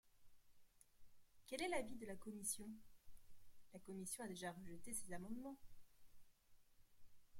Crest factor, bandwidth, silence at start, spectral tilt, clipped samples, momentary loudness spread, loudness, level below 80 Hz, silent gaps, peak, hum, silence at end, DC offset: 22 dB; 16.5 kHz; 0.05 s; -3.5 dB/octave; under 0.1%; 17 LU; -50 LUFS; -72 dBFS; none; -30 dBFS; none; 0 s; under 0.1%